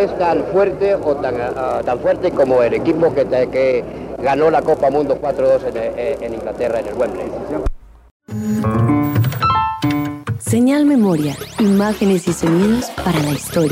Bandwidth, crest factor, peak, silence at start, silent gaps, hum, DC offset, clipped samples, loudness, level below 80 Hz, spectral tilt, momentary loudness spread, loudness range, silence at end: 16 kHz; 14 dB; -4 dBFS; 0 s; 8.11-8.20 s; none; under 0.1%; under 0.1%; -17 LUFS; -38 dBFS; -6.5 dB/octave; 8 LU; 4 LU; 0 s